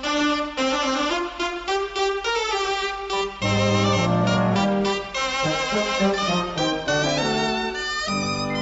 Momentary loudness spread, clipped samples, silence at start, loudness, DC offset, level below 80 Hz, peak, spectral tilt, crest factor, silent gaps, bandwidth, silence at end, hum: 5 LU; under 0.1%; 0 s; -22 LUFS; under 0.1%; -46 dBFS; -8 dBFS; -4.5 dB/octave; 14 dB; none; 8 kHz; 0 s; none